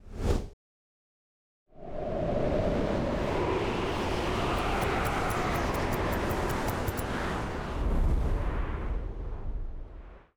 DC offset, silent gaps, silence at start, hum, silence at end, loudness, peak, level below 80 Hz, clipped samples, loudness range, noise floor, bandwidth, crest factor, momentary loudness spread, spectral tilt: under 0.1%; 0.53-1.66 s; 0.05 s; none; 0.2 s; -31 LUFS; -14 dBFS; -36 dBFS; under 0.1%; 4 LU; under -90 dBFS; over 20 kHz; 16 dB; 11 LU; -6 dB/octave